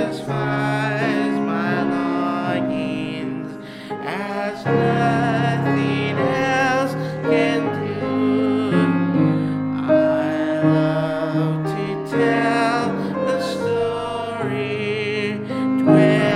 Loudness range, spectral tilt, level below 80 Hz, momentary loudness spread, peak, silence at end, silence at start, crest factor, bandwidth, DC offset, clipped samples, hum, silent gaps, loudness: 4 LU; -7 dB/octave; -54 dBFS; 7 LU; -2 dBFS; 0 s; 0 s; 18 dB; 12 kHz; under 0.1%; under 0.1%; none; none; -20 LUFS